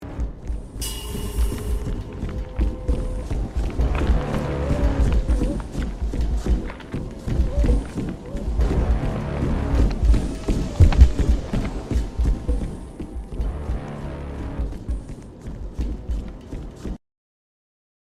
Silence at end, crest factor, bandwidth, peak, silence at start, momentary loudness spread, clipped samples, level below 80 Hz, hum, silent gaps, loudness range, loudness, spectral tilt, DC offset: 1.05 s; 22 dB; 14 kHz; 0 dBFS; 0 s; 12 LU; under 0.1%; -24 dBFS; none; none; 11 LU; -25 LUFS; -7 dB/octave; under 0.1%